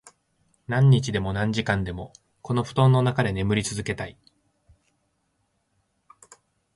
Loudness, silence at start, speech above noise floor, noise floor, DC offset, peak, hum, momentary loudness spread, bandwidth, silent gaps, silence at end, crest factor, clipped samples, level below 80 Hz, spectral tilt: -23 LUFS; 0.7 s; 50 dB; -72 dBFS; under 0.1%; -8 dBFS; none; 16 LU; 11.5 kHz; none; 2.65 s; 18 dB; under 0.1%; -48 dBFS; -6 dB/octave